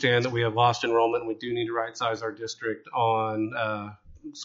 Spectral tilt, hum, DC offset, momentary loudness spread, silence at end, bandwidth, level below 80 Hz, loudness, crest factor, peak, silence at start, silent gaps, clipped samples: -3.5 dB/octave; none; under 0.1%; 11 LU; 0 s; 7.8 kHz; -62 dBFS; -27 LUFS; 18 dB; -8 dBFS; 0 s; none; under 0.1%